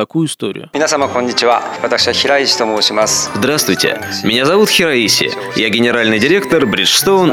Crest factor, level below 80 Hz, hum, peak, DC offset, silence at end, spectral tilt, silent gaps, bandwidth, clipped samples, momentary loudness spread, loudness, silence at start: 12 dB; -52 dBFS; none; 0 dBFS; under 0.1%; 0 s; -3 dB/octave; none; 17 kHz; under 0.1%; 7 LU; -12 LUFS; 0 s